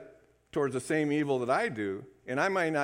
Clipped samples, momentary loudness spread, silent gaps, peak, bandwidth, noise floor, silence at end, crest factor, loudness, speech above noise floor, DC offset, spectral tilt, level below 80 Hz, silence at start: under 0.1%; 8 LU; none; -14 dBFS; 15.5 kHz; -58 dBFS; 0 s; 18 dB; -30 LUFS; 28 dB; under 0.1%; -5.5 dB/octave; -70 dBFS; 0 s